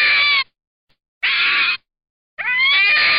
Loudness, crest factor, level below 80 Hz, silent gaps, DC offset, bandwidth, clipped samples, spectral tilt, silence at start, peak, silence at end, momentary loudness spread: -15 LUFS; 10 dB; -62 dBFS; 0.67-0.87 s, 1.08-1.21 s, 2.10-2.37 s; 0.2%; 5.6 kHz; under 0.1%; 5 dB/octave; 0 s; -8 dBFS; 0 s; 13 LU